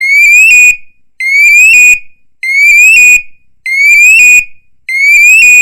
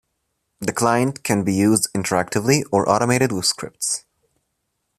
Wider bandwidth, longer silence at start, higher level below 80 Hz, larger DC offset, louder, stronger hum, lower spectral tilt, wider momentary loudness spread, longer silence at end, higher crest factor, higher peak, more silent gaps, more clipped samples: first, 17.5 kHz vs 14.5 kHz; second, 0 s vs 0.6 s; first, -42 dBFS vs -56 dBFS; neither; first, -1 LUFS vs -20 LUFS; neither; second, 3.5 dB/octave vs -4 dB/octave; first, 13 LU vs 7 LU; second, 0 s vs 1 s; second, 4 dB vs 20 dB; about the same, 0 dBFS vs -2 dBFS; neither; first, 0.1% vs under 0.1%